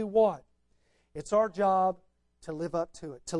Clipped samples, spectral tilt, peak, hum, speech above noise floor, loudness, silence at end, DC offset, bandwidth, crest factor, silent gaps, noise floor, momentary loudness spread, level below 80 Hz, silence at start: under 0.1%; -6 dB/octave; -14 dBFS; none; 41 dB; -29 LUFS; 0 s; under 0.1%; 11 kHz; 16 dB; none; -69 dBFS; 19 LU; -62 dBFS; 0 s